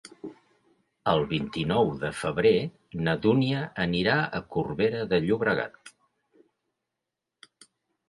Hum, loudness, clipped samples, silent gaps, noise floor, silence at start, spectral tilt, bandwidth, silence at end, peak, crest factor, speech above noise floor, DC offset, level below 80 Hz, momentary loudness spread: none; -26 LUFS; under 0.1%; none; -86 dBFS; 0.25 s; -6.5 dB/octave; 11.5 kHz; 2.2 s; -8 dBFS; 20 dB; 60 dB; under 0.1%; -56 dBFS; 9 LU